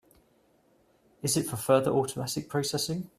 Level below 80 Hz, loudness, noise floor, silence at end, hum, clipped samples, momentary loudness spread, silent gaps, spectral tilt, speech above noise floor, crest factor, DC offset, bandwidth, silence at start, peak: -64 dBFS; -28 LUFS; -66 dBFS; 0.15 s; none; under 0.1%; 8 LU; none; -4.5 dB/octave; 37 dB; 22 dB; under 0.1%; 15.5 kHz; 1.25 s; -10 dBFS